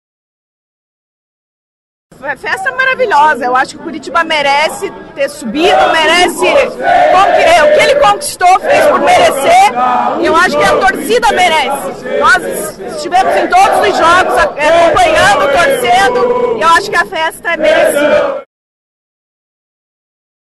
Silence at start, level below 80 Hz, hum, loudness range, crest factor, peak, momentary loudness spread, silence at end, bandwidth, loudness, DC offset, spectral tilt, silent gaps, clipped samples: 2.2 s; -40 dBFS; none; 6 LU; 10 dB; 0 dBFS; 10 LU; 2.1 s; 13 kHz; -9 LUFS; under 0.1%; -2.5 dB/octave; none; under 0.1%